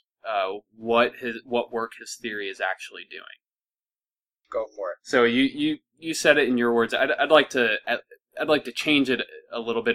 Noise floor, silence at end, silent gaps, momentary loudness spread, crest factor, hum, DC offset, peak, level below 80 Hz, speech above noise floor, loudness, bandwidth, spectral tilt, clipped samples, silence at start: under -90 dBFS; 0 s; none; 15 LU; 22 dB; none; under 0.1%; -2 dBFS; -66 dBFS; over 66 dB; -24 LUFS; 15.5 kHz; -3.5 dB/octave; under 0.1%; 0.25 s